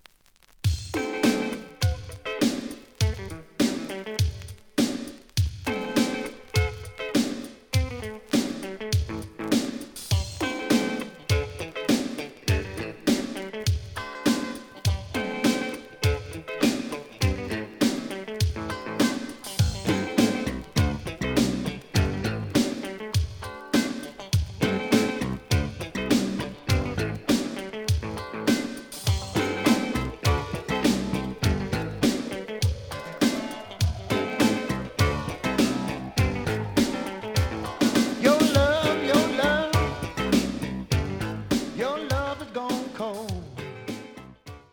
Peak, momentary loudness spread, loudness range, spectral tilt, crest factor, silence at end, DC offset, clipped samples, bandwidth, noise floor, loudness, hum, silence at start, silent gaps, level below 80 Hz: -6 dBFS; 10 LU; 5 LU; -5 dB/octave; 22 dB; 0.15 s; under 0.1%; under 0.1%; over 20 kHz; -58 dBFS; -27 LUFS; none; 0.65 s; none; -38 dBFS